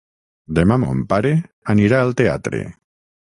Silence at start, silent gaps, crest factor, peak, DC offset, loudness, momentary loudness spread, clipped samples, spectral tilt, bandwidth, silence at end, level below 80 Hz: 0.5 s; 1.53-1.62 s; 16 dB; -2 dBFS; under 0.1%; -18 LUFS; 10 LU; under 0.1%; -8 dB/octave; 11 kHz; 0.55 s; -40 dBFS